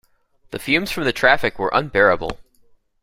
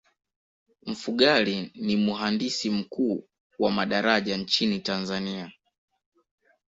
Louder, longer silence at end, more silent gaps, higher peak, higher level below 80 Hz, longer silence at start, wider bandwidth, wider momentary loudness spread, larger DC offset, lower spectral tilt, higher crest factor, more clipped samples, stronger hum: first, -18 LUFS vs -26 LUFS; second, 0.65 s vs 1.15 s; second, none vs 3.40-3.50 s; first, -2 dBFS vs -6 dBFS; first, -44 dBFS vs -64 dBFS; second, 0.5 s vs 0.85 s; first, 16 kHz vs 7.8 kHz; about the same, 15 LU vs 13 LU; neither; about the same, -4.5 dB/octave vs -4.5 dB/octave; about the same, 20 dB vs 22 dB; neither; neither